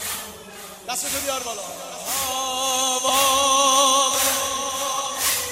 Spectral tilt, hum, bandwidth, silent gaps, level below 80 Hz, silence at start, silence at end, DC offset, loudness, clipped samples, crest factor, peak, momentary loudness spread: 0.5 dB/octave; none; 16.5 kHz; none; -56 dBFS; 0 s; 0 s; under 0.1%; -20 LUFS; under 0.1%; 18 dB; -4 dBFS; 15 LU